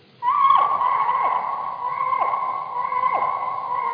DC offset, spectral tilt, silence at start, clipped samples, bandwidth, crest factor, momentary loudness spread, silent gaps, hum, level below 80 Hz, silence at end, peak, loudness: under 0.1%; -6 dB/octave; 0.2 s; under 0.1%; 5.2 kHz; 16 dB; 10 LU; none; none; -82 dBFS; 0 s; -6 dBFS; -21 LUFS